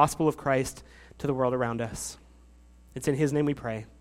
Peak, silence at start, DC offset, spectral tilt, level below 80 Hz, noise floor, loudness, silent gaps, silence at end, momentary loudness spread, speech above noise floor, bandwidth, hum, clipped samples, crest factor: -6 dBFS; 0 s; under 0.1%; -6 dB/octave; -52 dBFS; -54 dBFS; -29 LUFS; none; 0.15 s; 12 LU; 26 dB; 16 kHz; none; under 0.1%; 22 dB